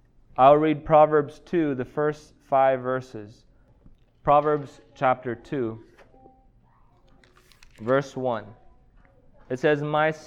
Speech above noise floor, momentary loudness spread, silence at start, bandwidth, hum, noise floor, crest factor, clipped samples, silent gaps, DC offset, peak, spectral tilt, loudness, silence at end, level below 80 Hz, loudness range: 35 dB; 18 LU; 0.4 s; 8 kHz; none; -58 dBFS; 20 dB; under 0.1%; none; under 0.1%; -4 dBFS; -7.5 dB/octave; -23 LUFS; 0.05 s; -54 dBFS; 11 LU